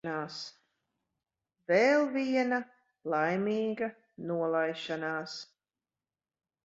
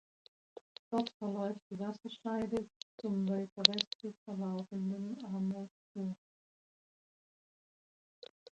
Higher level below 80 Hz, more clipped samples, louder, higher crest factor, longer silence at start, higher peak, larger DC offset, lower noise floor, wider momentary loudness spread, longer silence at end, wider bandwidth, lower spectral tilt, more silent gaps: about the same, -78 dBFS vs -78 dBFS; neither; first, -31 LUFS vs -37 LUFS; second, 20 dB vs 34 dB; second, 0.05 s vs 0.9 s; second, -12 dBFS vs -4 dBFS; neither; about the same, under -90 dBFS vs under -90 dBFS; second, 18 LU vs 21 LU; second, 1.2 s vs 2.4 s; second, 7.8 kHz vs 8.8 kHz; about the same, -5.5 dB/octave vs -5 dB/octave; second, none vs 1.14-1.20 s, 1.62-1.70 s, 2.76-2.98 s, 3.52-3.56 s, 3.87-3.99 s, 4.17-4.26 s, 5.71-5.95 s